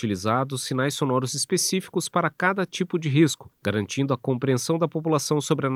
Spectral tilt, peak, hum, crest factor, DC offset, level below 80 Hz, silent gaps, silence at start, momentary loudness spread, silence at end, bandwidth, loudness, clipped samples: -4.5 dB/octave; -8 dBFS; none; 16 dB; under 0.1%; -68 dBFS; none; 0 s; 5 LU; 0 s; 16 kHz; -24 LUFS; under 0.1%